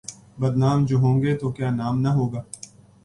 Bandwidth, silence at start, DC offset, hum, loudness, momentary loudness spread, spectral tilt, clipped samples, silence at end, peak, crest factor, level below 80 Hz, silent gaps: 11.5 kHz; 0.1 s; under 0.1%; none; -22 LUFS; 19 LU; -7.5 dB/octave; under 0.1%; 0.5 s; -8 dBFS; 14 dB; -52 dBFS; none